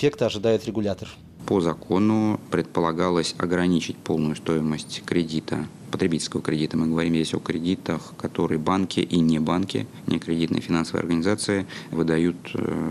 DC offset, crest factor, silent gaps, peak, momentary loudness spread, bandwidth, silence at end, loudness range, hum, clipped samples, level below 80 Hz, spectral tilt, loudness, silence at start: under 0.1%; 14 dB; none; -8 dBFS; 7 LU; 12.5 kHz; 0 s; 2 LU; none; under 0.1%; -52 dBFS; -6 dB/octave; -24 LUFS; 0 s